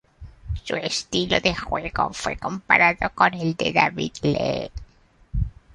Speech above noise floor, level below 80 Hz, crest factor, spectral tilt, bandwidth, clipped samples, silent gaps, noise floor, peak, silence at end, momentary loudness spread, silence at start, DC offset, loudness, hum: 30 dB; -38 dBFS; 22 dB; -4.5 dB/octave; 11.5 kHz; under 0.1%; none; -53 dBFS; -2 dBFS; 0.25 s; 13 LU; 0.2 s; under 0.1%; -22 LUFS; none